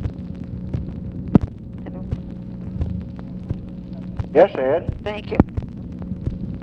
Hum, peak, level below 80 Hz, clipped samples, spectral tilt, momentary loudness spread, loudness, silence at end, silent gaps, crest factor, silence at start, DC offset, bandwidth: none; 0 dBFS; -34 dBFS; under 0.1%; -10 dB/octave; 16 LU; -24 LUFS; 0 s; none; 22 dB; 0 s; under 0.1%; 6.6 kHz